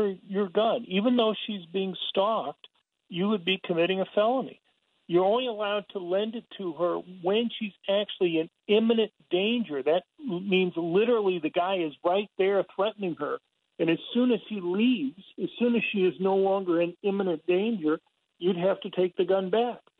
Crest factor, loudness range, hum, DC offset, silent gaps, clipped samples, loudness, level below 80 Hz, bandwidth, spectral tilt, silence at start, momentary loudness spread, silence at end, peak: 16 dB; 2 LU; none; under 0.1%; none; under 0.1%; -27 LUFS; -78 dBFS; 4.3 kHz; -9 dB/octave; 0 s; 8 LU; 0.2 s; -12 dBFS